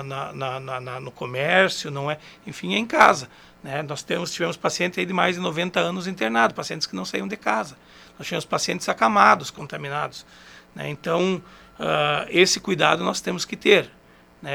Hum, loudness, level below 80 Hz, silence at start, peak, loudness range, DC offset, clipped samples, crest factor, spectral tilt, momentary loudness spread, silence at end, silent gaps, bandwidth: none; -22 LUFS; -60 dBFS; 0 s; 0 dBFS; 3 LU; under 0.1%; under 0.1%; 24 dB; -3.5 dB/octave; 16 LU; 0 s; none; 19.5 kHz